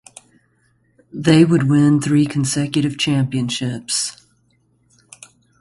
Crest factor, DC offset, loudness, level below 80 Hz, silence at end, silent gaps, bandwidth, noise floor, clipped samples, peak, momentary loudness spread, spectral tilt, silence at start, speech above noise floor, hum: 18 dB; under 0.1%; -17 LUFS; -54 dBFS; 1.5 s; none; 11.5 kHz; -61 dBFS; under 0.1%; 0 dBFS; 9 LU; -5.5 dB/octave; 1.15 s; 45 dB; none